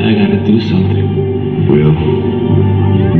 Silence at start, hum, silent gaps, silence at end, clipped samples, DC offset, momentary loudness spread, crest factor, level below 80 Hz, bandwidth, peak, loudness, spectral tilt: 0 s; none; none; 0 s; under 0.1%; under 0.1%; 4 LU; 10 dB; -28 dBFS; 4.6 kHz; 0 dBFS; -12 LUFS; -10 dB/octave